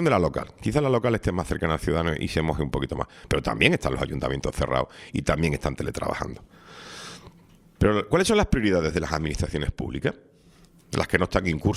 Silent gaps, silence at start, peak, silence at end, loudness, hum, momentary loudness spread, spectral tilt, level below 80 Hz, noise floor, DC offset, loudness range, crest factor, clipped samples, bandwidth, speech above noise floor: none; 0 s; 0 dBFS; 0 s; -25 LUFS; none; 12 LU; -5.5 dB/octave; -38 dBFS; -55 dBFS; under 0.1%; 3 LU; 24 dB; under 0.1%; 15.5 kHz; 30 dB